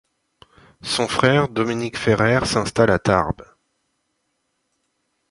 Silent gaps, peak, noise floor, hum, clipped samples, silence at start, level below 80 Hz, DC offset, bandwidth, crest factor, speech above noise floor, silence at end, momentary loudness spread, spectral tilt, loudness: none; -2 dBFS; -72 dBFS; none; under 0.1%; 0.85 s; -44 dBFS; under 0.1%; 11.5 kHz; 20 dB; 53 dB; 1.9 s; 8 LU; -5 dB/octave; -19 LUFS